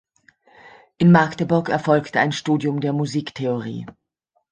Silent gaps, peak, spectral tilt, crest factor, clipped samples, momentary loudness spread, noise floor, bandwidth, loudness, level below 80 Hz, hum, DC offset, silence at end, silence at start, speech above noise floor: none; -2 dBFS; -7 dB/octave; 20 dB; under 0.1%; 12 LU; -71 dBFS; 8.8 kHz; -20 LUFS; -58 dBFS; none; under 0.1%; 0.6 s; 0.65 s; 51 dB